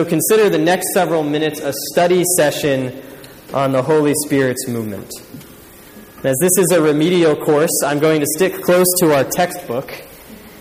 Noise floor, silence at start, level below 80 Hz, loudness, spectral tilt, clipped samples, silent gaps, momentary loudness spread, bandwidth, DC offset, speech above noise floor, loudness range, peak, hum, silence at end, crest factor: -40 dBFS; 0 s; -54 dBFS; -15 LUFS; -4 dB/octave; under 0.1%; none; 12 LU; 15.5 kHz; under 0.1%; 25 dB; 5 LU; -2 dBFS; none; 0 s; 14 dB